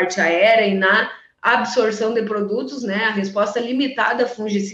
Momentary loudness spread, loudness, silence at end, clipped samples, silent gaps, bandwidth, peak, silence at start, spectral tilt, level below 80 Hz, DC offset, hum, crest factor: 9 LU; -18 LUFS; 0 s; under 0.1%; none; 8.4 kHz; -4 dBFS; 0 s; -4.5 dB/octave; -66 dBFS; under 0.1%; none; 16 dB